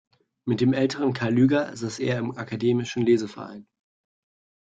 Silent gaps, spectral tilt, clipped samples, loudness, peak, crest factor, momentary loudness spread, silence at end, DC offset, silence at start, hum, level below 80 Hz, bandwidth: none; -6.5 dB/octave; under 0.1%; -24 LUFS; -8 dBFS; 16 dB; 13 LU; 1 s; under 0.1%; 0.45 s; none; -64 dBFS; 9 kHz